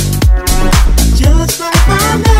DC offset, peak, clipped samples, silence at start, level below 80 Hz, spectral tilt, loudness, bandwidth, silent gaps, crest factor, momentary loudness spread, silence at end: under 0.1%; 0 dBFS; 0.2%; 0 s; -10 dBFS; -4.5 dB/octave; -10 LUFS; 16.5 kHz; none; 8 dB; 2 LU; 0 s